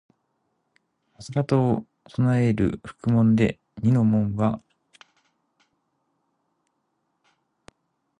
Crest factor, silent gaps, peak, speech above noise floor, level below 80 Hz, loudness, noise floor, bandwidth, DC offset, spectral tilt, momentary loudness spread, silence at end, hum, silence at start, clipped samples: 18 dB; none; -8 dBFS; 53 dB; -52 dBFS; -23 LUFS; -74 dBFS; 10 kHz; under 0.1%; -9 dB/octave; 10 LU; 3.6 s; none; 1.2 s; under 0.1%